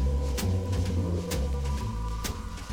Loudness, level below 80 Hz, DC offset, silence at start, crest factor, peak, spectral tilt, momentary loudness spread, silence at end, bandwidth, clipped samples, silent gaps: -31 LUFS; -32 dBFS; under 0.1%; 0 s; 12 dB; -18 dBFS; -6 dB/octave; 5 LU; 0 s; over 20 kHz; under 0.1%; none